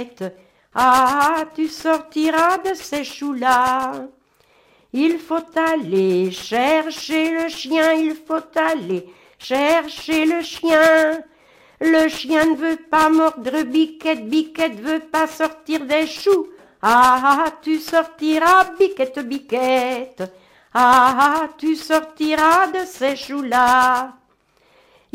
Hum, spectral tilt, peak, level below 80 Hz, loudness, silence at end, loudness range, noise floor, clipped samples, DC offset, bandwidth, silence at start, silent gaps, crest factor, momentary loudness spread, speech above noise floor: none; -4 dB/octave; -2 dBFS; -58 dBFS; -18 LUFS; 1.05 s; 4 LU; -59 dBFS; under 0.1%; under 0.1%; 16 kHz; 0 s; none; 16 dB; 12 LU; 41 dB